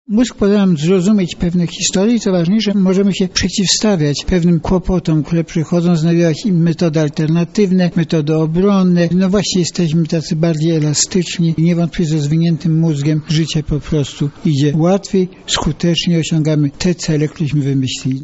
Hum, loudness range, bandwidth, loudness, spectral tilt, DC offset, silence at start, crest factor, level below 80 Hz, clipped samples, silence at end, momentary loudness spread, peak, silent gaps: none; 2 LU; 8.2 kHz; -14 LUFS; -5.5 dB/octave; 0.1%; 0.1 s; 14 dB; -34 dBFS; under 0.1%; 0 s; 4 LU; 0 dBFS; none